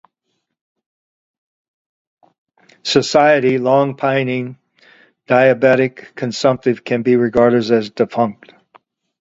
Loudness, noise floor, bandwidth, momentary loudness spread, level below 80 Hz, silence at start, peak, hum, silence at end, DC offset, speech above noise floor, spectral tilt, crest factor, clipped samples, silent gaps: -15 LUFS; -73 dBFS; 7.8 kHz; 9 LU; -58 dBFS; 2.85 s; 0 dBFS; none; 0.9 s; under 0.1%; 58 dB; -5.5 dB/octave; 18 dB; under 0.1%; none